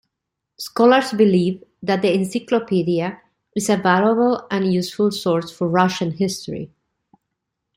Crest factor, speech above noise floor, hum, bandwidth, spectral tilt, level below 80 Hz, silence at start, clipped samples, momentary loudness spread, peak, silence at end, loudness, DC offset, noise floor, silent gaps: 18 dB; 63 dB; none; 16 kHz; -5.5 dB/octave; -60 dBFS; 0.6 s; under 0.1%; 13 LU; -2 dBFS; 1.1 s; -19 LUFS; under 0.1%; -81 dBFS; none